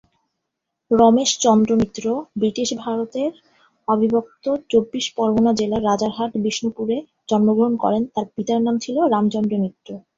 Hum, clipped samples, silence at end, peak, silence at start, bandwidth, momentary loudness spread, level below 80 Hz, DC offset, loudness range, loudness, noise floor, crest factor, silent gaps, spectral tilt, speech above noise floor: none; under 0.1%; 0.2 s; -2 dBFS; 0.9 s; 7.8 kHz; 9 LU; -54 dBFS; under 0.1%; 3 LU; -20 LUFS; -79 dBFS; 18 dB; none; -5 dB/octave; 60 dB